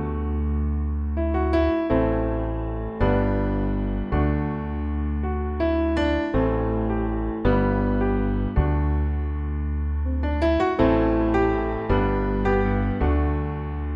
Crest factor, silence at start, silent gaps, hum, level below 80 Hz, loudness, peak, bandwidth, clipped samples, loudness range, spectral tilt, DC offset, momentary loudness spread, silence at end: 14 dB; 0 s; none; none; -26 dBFS; -24 LUFS; -8 dBFS; 5.6 kHz; under 0.1%; 2 LU; -9.5 dB/octave; under 0.1%; 6 LU; 0 s